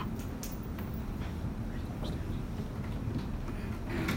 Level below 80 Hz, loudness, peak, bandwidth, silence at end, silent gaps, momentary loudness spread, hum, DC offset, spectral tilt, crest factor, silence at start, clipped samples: -42 dBFS; -38 LUFS; -18 dBFS; 16.5 kHz; 0 s; none; 2 LU; none; under 0.1%; -6.5 dB/octave; 18 dB; 0 s; under 0.1%